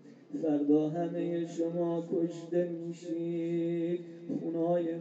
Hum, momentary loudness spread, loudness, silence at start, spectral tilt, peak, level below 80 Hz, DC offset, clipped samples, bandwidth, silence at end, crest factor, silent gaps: none; 9 LU; -33 LUFS; 0.05 s; -8.5 dB/octave; -16 dBFS; -86 dBFS; under 0.1%; under 0.1%; 7.8 kHz; 0 s; 16 dB; none